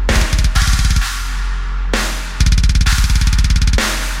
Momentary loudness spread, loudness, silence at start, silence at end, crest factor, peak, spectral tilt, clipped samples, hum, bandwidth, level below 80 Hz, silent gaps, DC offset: 8 LU; -16 LUFS; 0 s; 0 s; 12 dB; 0 dBFS; -3.5 dB/octave; under 0.1%; none; 16 kHz; -14 dBFS; none; under 0.1%